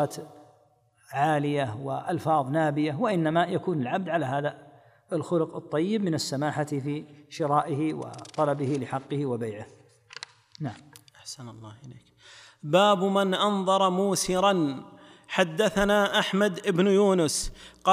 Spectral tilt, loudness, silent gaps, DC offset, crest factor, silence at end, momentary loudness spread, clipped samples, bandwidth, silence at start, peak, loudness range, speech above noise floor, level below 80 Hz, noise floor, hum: -5 dB/octave; -26 LUFS; none; under 0.1%; 20 dB; 0 s; 18 LU; under 0.1%; 15.5 kHz; 0 s; -8 dBFS; 8 LU; 37 dB; -54 dBFS; -63 dBFS; none